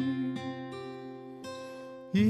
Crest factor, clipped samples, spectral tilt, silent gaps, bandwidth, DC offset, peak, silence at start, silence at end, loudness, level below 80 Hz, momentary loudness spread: 18 dB; under 0.1%; -7 dB/octave; none; 12 kHz; under 0.1%; -16 dBFS; 0 s; 0 s; -38 LUFS; -72 dBFS; 11 LU